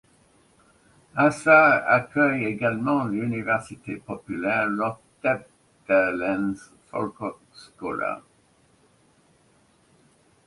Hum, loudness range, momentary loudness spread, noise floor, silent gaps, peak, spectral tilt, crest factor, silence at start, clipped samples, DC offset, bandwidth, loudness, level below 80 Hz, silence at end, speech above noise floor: none; 14 LU; 18 LU; -61 dBFS; none; -4 dBFS; -6.5 dB/octave; 22 dB; 1.15 s; under 0.1%; under 0.1%; 11.5 kHz; -23 LUFS; -62 dBFS; 2.3 s; 38 dB